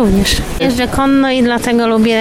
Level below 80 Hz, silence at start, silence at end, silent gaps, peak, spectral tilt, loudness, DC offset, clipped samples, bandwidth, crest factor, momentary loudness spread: -26 dBFS; 0 s; 0 s; none; -2 dBFS; -5 dB/octave; -12 LUFS; under 0.1%; under 0.1%; 16.5 kHz; 10 dB; 3 LU